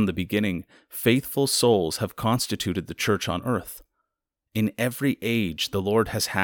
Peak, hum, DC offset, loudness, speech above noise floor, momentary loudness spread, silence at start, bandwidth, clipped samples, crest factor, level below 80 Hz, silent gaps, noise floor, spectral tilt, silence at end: -6 dBFS; none; under 0.1%; -25 LUFS; 59 dB; 8 LU; 0 s; over 20 kHz; under 0.1%; 20 dB; -52 dBFS; none; -84 dBFS; -4.5 dB/octave; 0 s